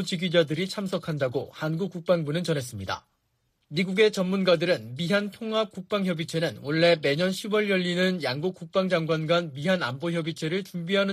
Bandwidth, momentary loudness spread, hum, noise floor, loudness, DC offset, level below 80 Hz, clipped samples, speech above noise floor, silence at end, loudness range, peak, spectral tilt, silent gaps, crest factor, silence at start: 15 kHz; 8 LU; none; -73 dBFS; -26 LUFS; under 0.1%; -68 dBFS; under 0.1%; 47 dB; 0 s; 3 LU; -8 dBFS; -5.5 dB/octave; none; 18 dB; 0 s